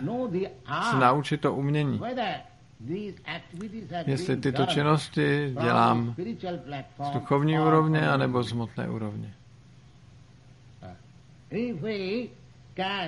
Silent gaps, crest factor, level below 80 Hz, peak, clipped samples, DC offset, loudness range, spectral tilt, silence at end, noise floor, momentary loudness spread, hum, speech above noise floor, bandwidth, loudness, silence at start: none; 22 dB; -62 dBFS; -6 dBFS; under 0.1%; under 0.1%; 11 LU; -7 dB/octave; 0 s; -53 dBFS; 17 LU; none; 26 dB; 11.5 kHz; -27 LUFS; 0 s